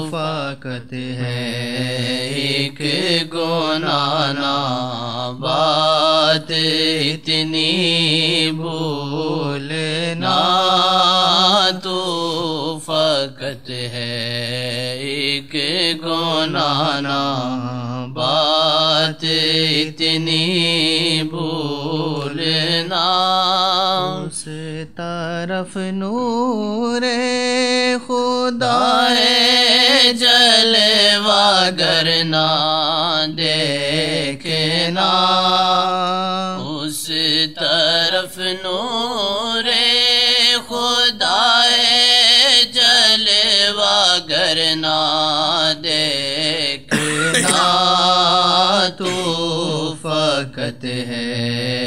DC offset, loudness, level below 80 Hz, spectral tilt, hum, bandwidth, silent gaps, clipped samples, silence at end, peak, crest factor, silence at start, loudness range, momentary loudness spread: 0.8%; -15 LUFS; -58 dBFS; -3 dB/octave; none; 16 kHz; none; under 0.1%; 0 s; 0 dBFS; 18 dB; 0 s; 8 LU; 12 LU